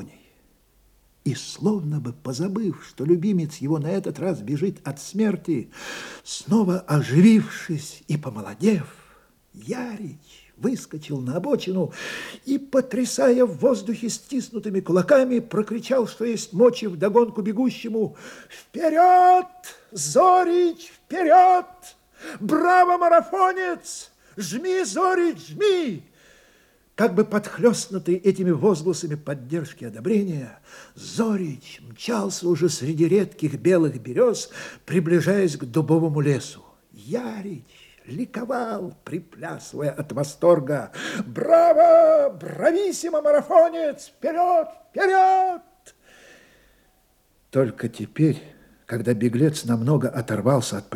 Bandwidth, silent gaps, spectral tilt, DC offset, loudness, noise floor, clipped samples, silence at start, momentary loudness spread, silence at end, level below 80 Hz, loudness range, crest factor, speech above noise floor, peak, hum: 16.5 kHz; none; -6 dB/octave; under 0.1%; -22 LUFS; -62 dBFS; under 0.1%; 0 s; 17 LU; 0 s; -66 dBFS; 9 LU; 18 dB; 41 dB; -4 dBFS; none